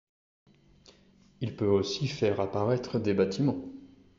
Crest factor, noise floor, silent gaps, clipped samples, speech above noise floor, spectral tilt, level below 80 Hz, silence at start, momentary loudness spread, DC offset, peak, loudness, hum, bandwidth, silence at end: 18 dB; -61 dBFS; none; under 0.1%; 32 dB; -6 dB/octave; -64 dBFS; 1.4 s; 12 LU; under 0.1%; -12 dBFS; -29 LUFS; none; 7.6 kHz; 0.3 s